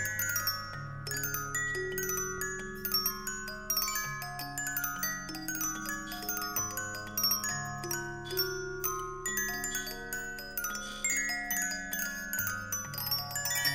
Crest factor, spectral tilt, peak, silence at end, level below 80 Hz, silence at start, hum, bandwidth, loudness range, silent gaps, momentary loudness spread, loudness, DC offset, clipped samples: 18 dB; -1.5 dB/octave; -16 dBFS; 0 s; -52 dBFS; 0 s; none; 16 kHz; 2 LU; none; 7 LU; -33 LUFS; under 0.1%; under 0.1%